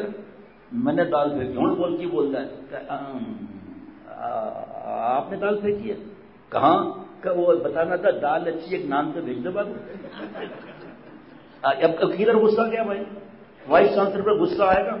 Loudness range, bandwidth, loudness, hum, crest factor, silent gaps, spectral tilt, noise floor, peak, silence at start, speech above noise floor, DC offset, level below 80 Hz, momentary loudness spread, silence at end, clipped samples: 8 LU; 5.8 kHz; -23 LUFS; none; 18 dB; none; -10.5 dB/octave; -46 dBFS; -6 dBFS; 0 s; 23 dB; under 0.1%; -58 dBFS; 18 LU; 0 s; under 0.1%